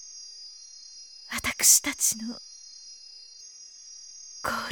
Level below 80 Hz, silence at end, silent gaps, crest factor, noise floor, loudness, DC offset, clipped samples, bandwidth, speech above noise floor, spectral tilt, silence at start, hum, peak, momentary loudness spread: -60 dBFS; 0 s; none; 24 dB; -48 dBFS; -23 LUFS; under 0.1%; under 0.1%; over 20 kHz; 23 dB; 0.5 dB/octave; 0 s; none; -6 dBFS; 26 LU